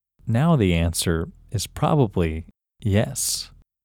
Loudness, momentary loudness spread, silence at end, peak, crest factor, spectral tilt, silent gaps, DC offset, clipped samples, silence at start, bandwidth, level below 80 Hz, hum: -23 LUFS; 11 LU; 0.35 s; -6 dBFS; 16 dB; -5 dB/octave; none; under 0.1%; under 0.1%; 0.25 s; 17.5 kHz; -38 dBFS; none